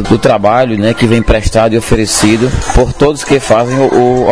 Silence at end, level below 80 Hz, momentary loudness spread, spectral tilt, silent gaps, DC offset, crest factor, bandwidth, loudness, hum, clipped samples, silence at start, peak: 0 s; -20 dBFS; 3 LU; -5 dB/octave; none; 3%; 8 dB; 11 kHz; -10 LUFS; none; 1%; 0 s; 0 dBFS